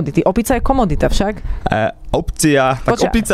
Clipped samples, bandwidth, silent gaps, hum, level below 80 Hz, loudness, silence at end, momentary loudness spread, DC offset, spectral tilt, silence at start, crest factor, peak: under 0.1%; 15.5 kHz; none; none; -24 dBFS; -16 LUFS; 0 s; 7 LU; under 0.1%; -5 dB/octave; 0 s; 14 dB; -2 dBFS